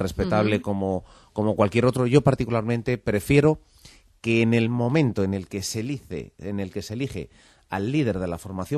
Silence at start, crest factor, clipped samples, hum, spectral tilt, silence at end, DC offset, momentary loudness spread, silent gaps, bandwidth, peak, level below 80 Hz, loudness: 0 s; 20 dB; under 0.1%; none; -6.5 dB/octave; 0 s; under 0.1%; 13 LU; none; 13.5 kHz; -4 dBFS; -46 dBFS; -24 LUFS